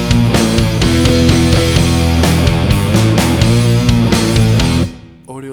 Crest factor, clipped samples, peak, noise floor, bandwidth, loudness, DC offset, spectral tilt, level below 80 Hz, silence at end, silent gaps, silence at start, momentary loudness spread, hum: 10 dB; under 0.1%; 0 dBFS; -31 dBFS; 20 kHz; -11 LUFS; under 0.1%; -5.5 dB/octave; -22 dBFS; 0 s; none; 0 s; 3 LU; none